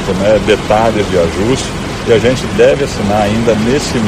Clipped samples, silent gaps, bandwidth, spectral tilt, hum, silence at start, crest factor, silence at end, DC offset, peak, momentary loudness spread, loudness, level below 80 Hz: under 0.1%; none; 15 kHz; -5.5 dB/octave; none; 0 s; 12 dB; 0 s; under 0.1%; 0 dBFS; 4 LU; -12 LUFS; -28 dBFS